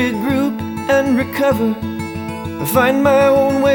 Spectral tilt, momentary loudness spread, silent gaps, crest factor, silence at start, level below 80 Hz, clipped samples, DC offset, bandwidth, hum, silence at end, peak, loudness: -5.5 dB/octave; 12 LU; none; 14 dB; 0 s; -46 dBFS; under 0.1%; under 0.1%; over 20 kHz; none; 0 s; 0 dBFS; -16 LUFS